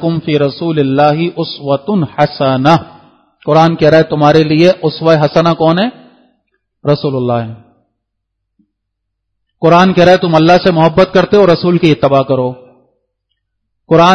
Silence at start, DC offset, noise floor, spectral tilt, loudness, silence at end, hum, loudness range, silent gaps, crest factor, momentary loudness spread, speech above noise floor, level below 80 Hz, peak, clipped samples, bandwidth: 0 s; under 0.1%; -72 dBFS; -7 dB/octave; -10 LUFS; 0 s; 50 Hz at -35 dBFS; 8 LU; none; 10 dB; 8 LU; 63 dB; -44 dBFS; 0 dBFS; 0.4%; 6.8 kHz